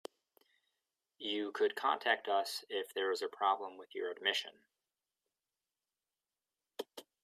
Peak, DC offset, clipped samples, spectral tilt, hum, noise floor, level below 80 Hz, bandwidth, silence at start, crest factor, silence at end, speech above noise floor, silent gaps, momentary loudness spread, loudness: -16 dBFS; under 0.1%; under 0.1%; -1 dB/octave; none; under -90 dBFS; under -90 dBFS; 15.5 kHz; 1.2 s; 22 dB; 0.2 s; over 53 dB; none; 15 LU; -36 LUFS